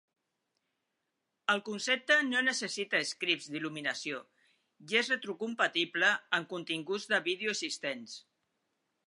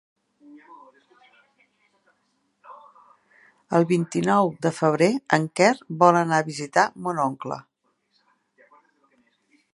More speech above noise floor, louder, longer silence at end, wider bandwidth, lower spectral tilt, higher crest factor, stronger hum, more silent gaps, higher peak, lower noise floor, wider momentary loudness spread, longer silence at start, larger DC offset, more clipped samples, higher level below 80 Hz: about the same, 51 dB vs 49 dB; second, -31 LUFS vs -22 LUFS; second, 0.85 s vs 2.15 s; about the same, 11.5 kHz vs 11.5 kHz; second, -2 dB/octave vs -5.5 dB/octave; about the same, 22 dB vs 24 dB; neither; neither; second, -12 dBFS vs 0 dBFS; first, -84 dBFS vs -71 dBFS; first, 11 LU vs 8 LU; first, 1.5 s vs 0.55 s; neither; neither; second, -88 dBFS vs -72 dBFS